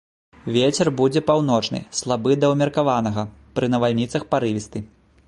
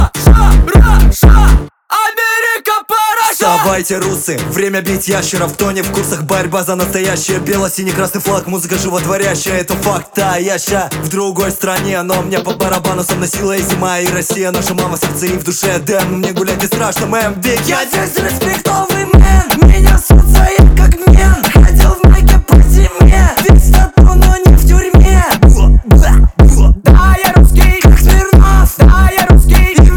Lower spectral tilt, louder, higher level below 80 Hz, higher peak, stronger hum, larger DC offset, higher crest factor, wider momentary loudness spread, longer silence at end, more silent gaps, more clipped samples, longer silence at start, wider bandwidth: about the same, -5.5 dB/octave vs -5 dB/octave; second, -21 LUFS vs -10 LUFS; second, -52 dBFS vs -10 dBFS; second, -4 dBFS vs 0 dBFS; neither; neither; first, 16 dB vs 8 dB; about the same, 10 LU vs 8 LU; first, 0.4 s vs 0 s; neither; second, under 0.1% vs 3%; first, 0.45 s vs 0 s; second, 11.5 kHz vs 19 kHz